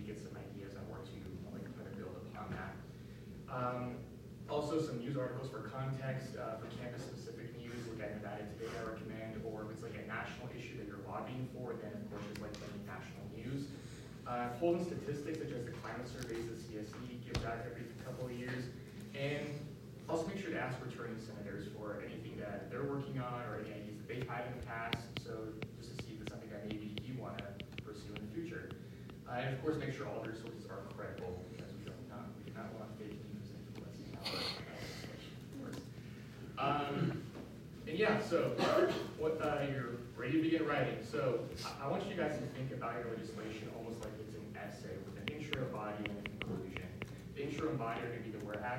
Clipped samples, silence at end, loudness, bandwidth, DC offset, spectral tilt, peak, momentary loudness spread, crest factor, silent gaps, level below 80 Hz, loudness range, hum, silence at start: under 0.1%; 0 s; -42 LUFS; 16 kHz; under 0.1%; -6 dB/octave; -16 dBFS; 12 LU; 26 dB; none; -64 dBFS; 9 LU; none; 0 s